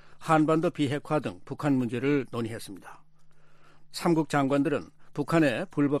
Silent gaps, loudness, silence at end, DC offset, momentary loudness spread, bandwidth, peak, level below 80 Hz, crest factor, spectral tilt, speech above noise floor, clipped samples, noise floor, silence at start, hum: none; -27 LUFS; 0 s; under 0.1%; 13 LU; 14 kHz; -8 dBFS; -60 dBFS; 18 dB; -6.5 dB/octave; 22 dB; under 0.1%; -49 dBFS; 0.05 s; none